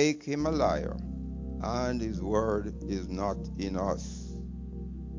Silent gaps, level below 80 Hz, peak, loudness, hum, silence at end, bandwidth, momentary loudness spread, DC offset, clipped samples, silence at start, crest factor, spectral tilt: none; -40 dBFS; -12 dBFS; -33 LUFS; none; 0 s; 7.6 kHz; 12 LU; under 0.1%; under 0.1%; 0 s; 20 dB; -6 dB/octave